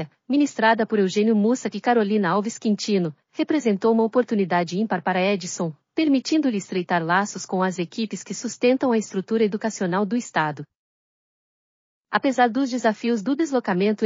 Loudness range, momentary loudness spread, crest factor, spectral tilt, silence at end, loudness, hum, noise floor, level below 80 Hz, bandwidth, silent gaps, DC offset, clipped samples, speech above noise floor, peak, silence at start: 4 LU; 8 LU; 16 dB; -4.5 dB/octave; 0 s; -22 LUFS; none; under -90 dBFS; -80 dBFS; 7.4 kHz; 10.76-12.05 s; under 0.1%; under 0.1%; over 68 dB; -6 dBFS; 0 s